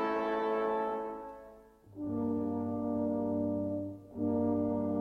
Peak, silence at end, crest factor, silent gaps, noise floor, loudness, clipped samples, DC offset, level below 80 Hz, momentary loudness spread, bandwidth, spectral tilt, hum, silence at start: -22 dBFS; 0 s; 12 dB; none; -56 dBFS; -34 LUFS; under 0.1%; under 0.1%; -64 dBFS; 11 LU; 6 kHz; -9 dB/octave; none; 0 s